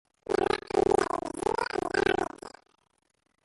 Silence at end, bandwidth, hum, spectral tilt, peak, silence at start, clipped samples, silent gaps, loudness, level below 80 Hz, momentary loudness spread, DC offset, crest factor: 0.95 s; 11.5 kHz; none; -4.5 dB/octave; -12 dBFS; 0.3 s; under 0.1%; none; -29 LUFS; -54 dBFS; 9 LU; under 0.1%; 18 dB